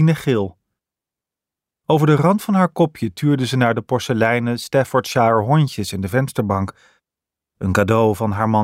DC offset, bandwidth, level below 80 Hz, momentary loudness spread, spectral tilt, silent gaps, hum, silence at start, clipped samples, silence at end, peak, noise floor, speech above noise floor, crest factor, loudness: under 0.1%; 16 kHz; -52 dBFS; 6 LU; -6.5 dB/octave; none; none; 0 s; under 0.1%; 0 s; -2 dBFS; -87 dBFS; 70 dB; 16 dB; -18 LUFS